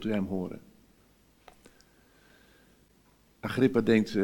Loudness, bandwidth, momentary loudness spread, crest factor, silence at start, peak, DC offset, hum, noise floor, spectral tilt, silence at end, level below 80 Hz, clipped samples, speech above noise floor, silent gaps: -28 LUFS; 18 kHz; 16 LU; 22 dB; 0 s; -10 dBFS; under 0.1%; none; -63 dBFS; -7 dB/octave; 0 s; -62 dBFS; under 0.1%; 36 dB; none